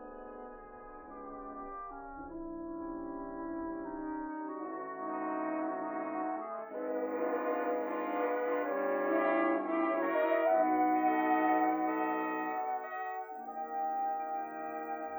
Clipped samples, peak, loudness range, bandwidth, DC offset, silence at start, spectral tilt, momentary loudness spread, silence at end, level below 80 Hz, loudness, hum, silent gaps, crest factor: under 0.1%; -18 dBFS; 12 LU; over 20 kHz; under 0.1%; 0 s; -8.5 dB/octave; 16 LU; 0 s; -64 dBFS; -34 LUFS; none; none; 16 dB